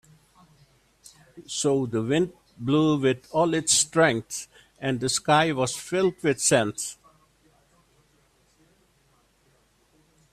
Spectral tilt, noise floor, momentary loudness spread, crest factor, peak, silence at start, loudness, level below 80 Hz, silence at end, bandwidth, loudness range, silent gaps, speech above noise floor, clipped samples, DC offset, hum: -3.5 dB/octave; -64 dBFS; 13 LU; 20 dB; -6 dBFS; 1.35 s; -24 LUFS; -62 dBFS; 3.4 s; 15 kHz; 6 LU; none; 40 dB; under 0.1%; under 0.1%; none